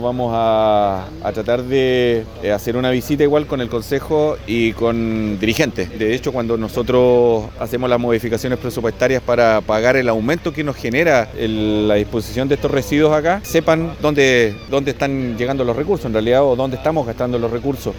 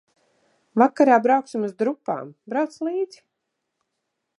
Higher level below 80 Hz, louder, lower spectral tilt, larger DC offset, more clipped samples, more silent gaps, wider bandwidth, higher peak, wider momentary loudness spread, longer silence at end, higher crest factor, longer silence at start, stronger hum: first, -38 dBFS vs -82 dBFS; first, -17 LUFS vs -22 LUFS; about the same, -6 dB/octave vs -6.5 dB/octave; neither; neither; neither; first, 18 kHz vs 11 kHz; about the same, 0 dBFS vs -2 dBFS; second, 7 LU vs 13 LU; second, 0 s vs 1.35 s; second, 16 dB vs 22 dB; second, 0 s vs 0.75 s; neither